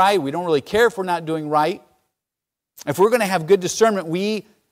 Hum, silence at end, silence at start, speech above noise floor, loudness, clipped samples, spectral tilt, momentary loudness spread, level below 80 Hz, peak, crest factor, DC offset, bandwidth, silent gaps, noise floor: none; 0.3 s; 0 s; 67 dB; -19 LUFS; under 0.1%; -4.5 dB/octave; 9 LU; -58 dBFS; -4 dBFS; 16 dB; under 0.1%; 16 kHz; none; -86 dBFS